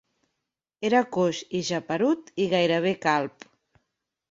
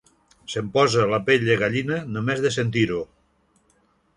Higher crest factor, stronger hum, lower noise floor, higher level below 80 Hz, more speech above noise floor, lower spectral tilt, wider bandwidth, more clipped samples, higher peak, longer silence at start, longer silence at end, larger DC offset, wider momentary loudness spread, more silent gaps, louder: about the same, 20 dB vs 18 dB; neither; first, -84 dBFS vs -64 dBFS; second, -70 dBFS vs -56 dBFS; first, 59 dB vs 42 dB; about the same, -5 dB/octave vs -5.5 dB/octave; second, 7.8 kHz vs 11 kHz; neither; about the same, -6 dBFS vs -6 dBFS; first, 0.8 s vs 0.5 s; second, 1 s vs 1.15 s; neither; second, 6 LU vs 12 LU; neither; second, -25 LUFS vs -22 LUFS